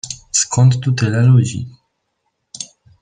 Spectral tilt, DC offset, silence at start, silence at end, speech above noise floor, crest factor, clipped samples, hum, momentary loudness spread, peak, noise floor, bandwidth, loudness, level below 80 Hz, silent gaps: -5 dB/octave; under 0.1%; 0.05 s; 0.4 s; 58 dB; 14 dB; under 0.1%; none; 18 LU; -2 dBFS; -70 dBFS; 9.6 kHz; -14 LUFS; -50 dBFS; none